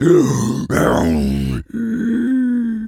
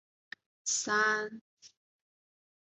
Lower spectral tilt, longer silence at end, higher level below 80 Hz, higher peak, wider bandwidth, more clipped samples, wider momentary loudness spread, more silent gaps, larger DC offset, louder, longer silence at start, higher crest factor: first, -6.5 dB/octave vs -0.5 dB/octave; second, 0 s vs 0.95 s; first, -34 dBFS vs -84 dBFS; first, -2 dBFS vs -18 dBFS; first, 16 kHz vs 8.2 kHz; neither; second, 8 LU vs 23 LU; second, none vs 1.41-1.57 s; neither; first, -17 LUFS vs -31 LUFS; second, 0 s vs 0.65 s; about the same, 14 dB vs 18 dB